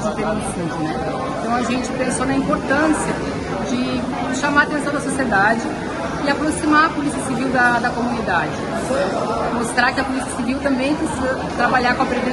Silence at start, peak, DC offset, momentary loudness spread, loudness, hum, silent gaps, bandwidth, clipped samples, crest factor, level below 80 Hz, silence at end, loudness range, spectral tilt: 0 s; -2 dBFS; under 0.1%; 7 LU; -19 LUFS; none; none; 12 kHz; under 0.1%; 18 dB; -40 dBFS; 0 s; 2 LU; -4.5 dB/octave